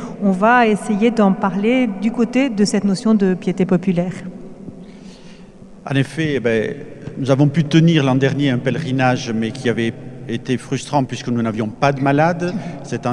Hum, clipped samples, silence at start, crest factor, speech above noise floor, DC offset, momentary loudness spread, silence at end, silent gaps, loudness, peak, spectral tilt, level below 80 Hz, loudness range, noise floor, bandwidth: none; under 0.1%; 0 s; 16 dB; 23 dB; under 0.1%; 13 LU; 0 s; none; -17 LUFS; 0 dBFS; -6.5 dB/octave; -50 dBFS; 6 LU; -39 dBFS; 11.5 kHz